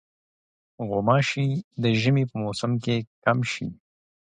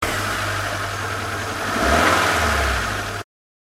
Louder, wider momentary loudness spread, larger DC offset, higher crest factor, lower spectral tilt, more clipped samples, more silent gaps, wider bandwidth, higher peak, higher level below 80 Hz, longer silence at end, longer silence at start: second, -25 LUFS vs -20 LUFS; about the same, 8 LU vs 9 LU; neither; about the same, 20 dB vs 18 dB; first, -6.5 dB/octave vs -3.5 dB/octave; neither; first, 1.64-1.71 s, 3.07-3.22 s vs none; second, 10 kHz vs 16 kHz; about the same, -6 dBFS vs -4 dBFS; second, -60 dBFS vs -32 dBFS; first, 0.6 s vs 0.4 s; first, 0.8 s vs 0 s